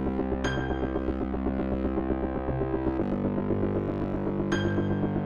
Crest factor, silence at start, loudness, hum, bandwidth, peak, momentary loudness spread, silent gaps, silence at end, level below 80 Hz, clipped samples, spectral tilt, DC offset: 14 dB; 0 s; -29 LUFS; none; 7 kHz; -14 dBFS; 3 LU; none; 0 s; -38 dBFS; under 0.1%; -8 dB/octave; under 0.1%